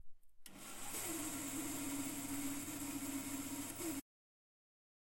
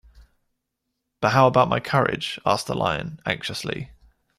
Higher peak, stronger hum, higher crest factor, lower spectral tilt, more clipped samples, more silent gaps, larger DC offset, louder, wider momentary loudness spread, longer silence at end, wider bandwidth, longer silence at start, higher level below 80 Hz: second, -30 dBFS vs -4 dBFS; neither; about the same, 16 dB vs 20 dB; second, -2.5 dB/octave vs -5.5 dB/octave; neither; neither; neither; second, -43 LUFS vs -22 LUFS; second, 8 LU vs 12 LU; first, 1 s vs 0.45 s; first, 16.5 kHz vs 14.5 kHz; second, 0 s vs 0.2 s; second, -64 dBFS vs -52 dBFS